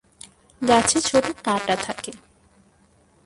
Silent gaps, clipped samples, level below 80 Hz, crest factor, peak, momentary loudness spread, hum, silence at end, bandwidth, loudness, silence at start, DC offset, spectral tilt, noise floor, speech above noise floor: none; under 0.1%; -54 dBFS; 22 dB; -2 dBFS; 14 LU; none; 1.1 s; 11.5 kHz; -21 LUFS; 0.6 s; under 0.1%; -2.5 dB/octave; -58 dBFS; 37 dB